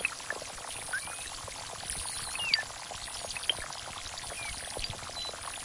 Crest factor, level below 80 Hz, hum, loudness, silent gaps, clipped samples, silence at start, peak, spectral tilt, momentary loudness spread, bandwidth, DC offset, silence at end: 26 dB; -54 dBFS; none; -35 LUFS; none; under 0.1%; 0 s; -12 dBFS; -0.5 dB/octave; 9 LU; 11.5 kHz; under 0.1%; 0 s